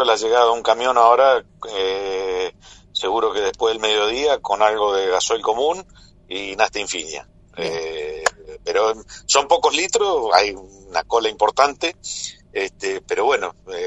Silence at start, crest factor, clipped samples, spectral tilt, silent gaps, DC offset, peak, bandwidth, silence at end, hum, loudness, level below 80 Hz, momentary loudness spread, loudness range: 0 s; 20 dB; under 0.1%; -1 dB/octave; none; under 0.1%; 0 dBFS; 11.5 kHz; 0 s; none; -19 LUFS; -52 dBFS; 12 LU; 5 LU